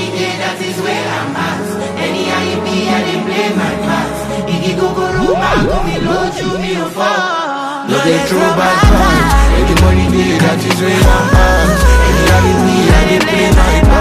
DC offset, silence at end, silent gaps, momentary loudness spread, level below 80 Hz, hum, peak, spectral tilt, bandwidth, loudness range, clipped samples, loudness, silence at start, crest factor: under 0.1%; 0 s; none; 8 LU; -16 dBFS; none; 0 dBFS; -5.5 dB/octave; 15.5 kHz; 5 LU; under 0.1%; -12 LUFS; 0 s; 10 dB